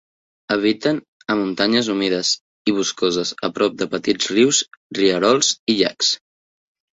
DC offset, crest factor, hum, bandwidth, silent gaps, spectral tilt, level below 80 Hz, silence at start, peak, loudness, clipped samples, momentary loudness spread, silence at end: under 0.1%; 18 dB; none; 8.4 kHz; 1.08-1.20 s, 2.41-2.65 s, 4.77-4.90 s, 5.59-5.67 s; -3 dB/octave; -60 dBFS; 0.5 s; -2 dBFS; -19 LUFS; under 0.1%; 8 LU; 0.75 s